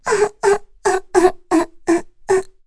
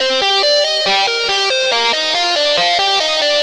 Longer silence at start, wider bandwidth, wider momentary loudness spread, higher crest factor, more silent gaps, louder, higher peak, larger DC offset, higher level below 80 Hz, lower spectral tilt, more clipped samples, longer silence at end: about the same, 0.05 s vs 0 s; second, 11 kHz vs 13 kHz; about the same, 4 LU vs 2 LU; about the same, 16 dB vs 12 dB; neither; second, -18 LUFS vs -12 LUFS; about the same, -2 dBFS vs -2 dBFS; neither; first, -44 dBFS vs -56 dBFS; first, -4 dB/octave vs 0 dB/octave; neither; first, 0.15 s vs 0 s